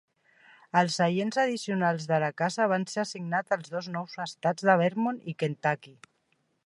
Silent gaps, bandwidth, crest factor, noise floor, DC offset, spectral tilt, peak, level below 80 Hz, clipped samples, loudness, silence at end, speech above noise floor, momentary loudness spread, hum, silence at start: none; 11.5 kHz; 20 dB; -73 dBFS; under 0.1%; -5.5 dB/octave; -8 dBFS; -78 dBFS; under 0.1%; -28 LUFS; 0.75 s; 45 dB; 10 LU; none; 0.75 s